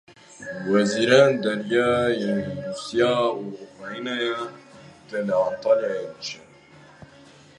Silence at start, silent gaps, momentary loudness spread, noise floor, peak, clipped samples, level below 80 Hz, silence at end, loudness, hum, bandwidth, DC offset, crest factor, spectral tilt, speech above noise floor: 0.4 s; none; 18 LU; -50 dBFS; -2 dBFS; under 0.1%; -60 dBFS; 1.2 s; -23 LUFS; none; 11 kHz; under 0.1%; 22 dB; -5 dB/octave; 27 dB